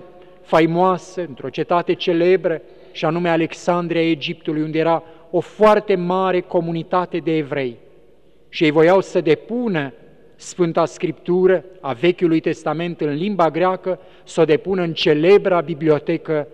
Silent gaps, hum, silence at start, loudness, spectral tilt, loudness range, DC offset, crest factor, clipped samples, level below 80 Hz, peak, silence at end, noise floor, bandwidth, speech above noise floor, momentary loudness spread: none; none; 0 s; -18 LUFS; -6.5 dB/octave; 2 LU; 0.4%; 16 dB; under 0.1%; -58 dBFS; -2 dBFS; 0.05 s; -53 dBFS; 9.2 kHz; 35 dB; 11 LU